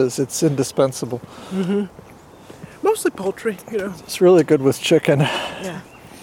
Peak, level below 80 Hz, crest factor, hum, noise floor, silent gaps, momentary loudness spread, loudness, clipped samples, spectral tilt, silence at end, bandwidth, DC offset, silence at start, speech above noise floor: -2 dBFS; -58 dBFS; 16 dB; none; -42 dBFS; none; 16 LU; -19 LUFS; under 0.1%; -5.5 dB/octave; 0 s; 17 kHz; under 0.1%; 0 s; 23 dB